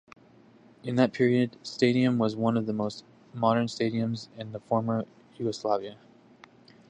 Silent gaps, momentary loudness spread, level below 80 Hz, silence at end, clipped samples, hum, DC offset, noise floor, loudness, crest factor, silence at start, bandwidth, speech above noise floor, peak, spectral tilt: none; 16 LU; -68 dBFS; 0.95 s; under 0.1%; none; under 0.1%; -56 dBFS; -28 LUFS; 20 dB; 0.85 s; 9.6 kHz; 29 dB; -8 dBFS; -7 dB/octave